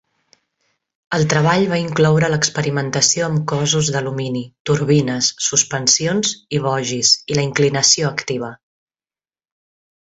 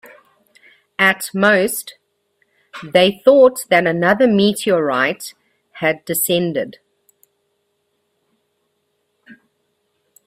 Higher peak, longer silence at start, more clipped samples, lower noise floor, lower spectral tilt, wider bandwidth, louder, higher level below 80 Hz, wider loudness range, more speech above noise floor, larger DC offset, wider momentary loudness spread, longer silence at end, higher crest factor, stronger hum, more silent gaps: about the same, 0 dBFS vs 0 dBFS; about the same, 1.1 s vs 1 s; neither; first, under -90 dBFS vs -69 dBFS; about the same, -3.5 dB/octave vs -4 dB/octave; second, 8.2 kHz vs 16 kHz; about the same, -16 LUFS vs -15 LUFS; first, -54 dBFS vs -62 dBFS; second, 2 LU vs 9 LU; first, over 73 dB vs 54 dB; neither; second, 9 LU vs 18 LU; first, 1.5 s vs 0.95 s; about the same, 18 dB vs 18 dB; neither; first, 4.60-4.65 s vs none